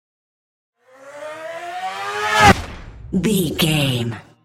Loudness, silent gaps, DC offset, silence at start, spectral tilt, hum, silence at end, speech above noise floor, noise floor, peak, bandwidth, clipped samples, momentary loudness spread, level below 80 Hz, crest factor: -18 LUFS; none; under 0.1%; 1.05 s; -4.5 dB/octave; none; 0.25 s; 21 dB; -40 dBFS; 0 dBFS; 16.5 kHz; under 0.1%; 21 LU; -40 dBFS; 20 dB